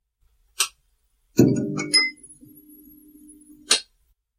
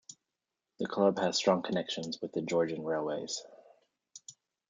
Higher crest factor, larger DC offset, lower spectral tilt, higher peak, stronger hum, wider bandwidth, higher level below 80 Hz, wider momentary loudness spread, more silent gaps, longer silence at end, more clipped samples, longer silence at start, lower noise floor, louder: about the same, 24 dB vs 22 dB; neither; second, -3 dB/octave vs -4.5 dB/octave; first, -2 dBFS vs -14 dBFS; neither; first, 15.5 kHz vs 9.6 kHz; first, -60 dBFS vs -78 dBFS; second, 7 LU vs 22 LU; neither; first, 0.55 s vs 0.4 s; neither; first, 0.6 s vs 0.1 s; second, -67 dBFS vs -88 dBFS; first, -21 LUFS vs -32 LUFS